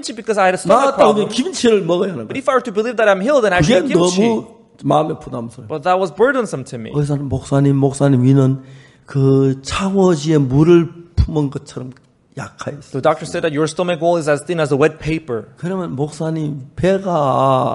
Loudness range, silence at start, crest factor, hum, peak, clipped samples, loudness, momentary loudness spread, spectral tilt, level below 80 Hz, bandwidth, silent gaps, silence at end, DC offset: 4 LU; 0 s; 16 dB; none; 0 dBFS; under 0.1%; -16 LUFS; 13 LU; -6.5 dB/octave; -36 dBFS; 11.5 kHz; none; 0 s; under 0.1%